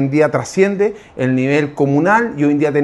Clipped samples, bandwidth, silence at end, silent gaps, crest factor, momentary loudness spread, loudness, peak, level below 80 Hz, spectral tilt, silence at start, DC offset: under 0.1%; 11.5 kHz; 0 s; none; 14 dB; 5 LU; -15 LUFS; 0 dBFS; -54 dBFS; -7 dB/octave; 0 s; under 0.1%